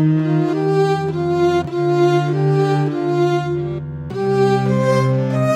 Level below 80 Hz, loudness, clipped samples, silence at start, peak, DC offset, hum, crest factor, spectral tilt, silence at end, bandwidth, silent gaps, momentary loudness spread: -50 dBFS; -17 LUFS; under 0.1%; 0 s; -4 dBFS; under 0.1%; none; 12 dB; -8 dB/octave; 0 s; 10.5 kHz; none; 6 LU